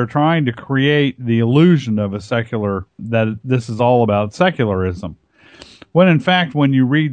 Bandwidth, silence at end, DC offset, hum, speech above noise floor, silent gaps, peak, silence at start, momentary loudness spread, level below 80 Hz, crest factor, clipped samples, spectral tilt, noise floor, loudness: 9.2 kHz; 0 s; under 0.1%; none; 28 dB; none; 0 dBFS; 0 s; 9 LU; -50 dBFS; 14 dB; under 0.1%; -7.5 dB/octave; -43 dBFS; -16 LUFS